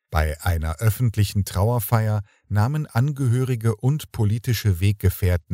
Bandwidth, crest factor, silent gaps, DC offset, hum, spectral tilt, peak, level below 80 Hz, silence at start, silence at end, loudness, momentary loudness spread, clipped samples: 16 kHz; 18 dB; none; under 0.1%; none; -6.5 dB/octave; -4 dBFS; -34 dBFS; 0.1 s; 0 s; -23 LUFS; 3 LU; under 0.1%